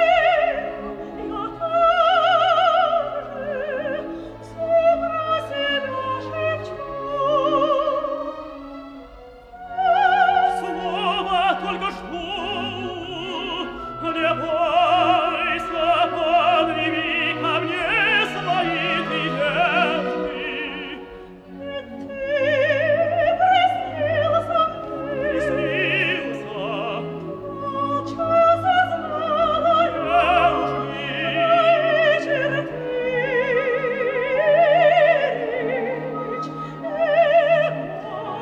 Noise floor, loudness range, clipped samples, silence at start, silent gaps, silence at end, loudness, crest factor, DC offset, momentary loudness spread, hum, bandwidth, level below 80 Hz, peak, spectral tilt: -42 dBFS; 5 LU; under 0.1%; 0 s; none; 0 s; -20 LUFS; 16 dB; under 0.1%; 13 LU; none; 9.6 kHz; -50 dBFS; -6 dBFS; -5.5 dB/octave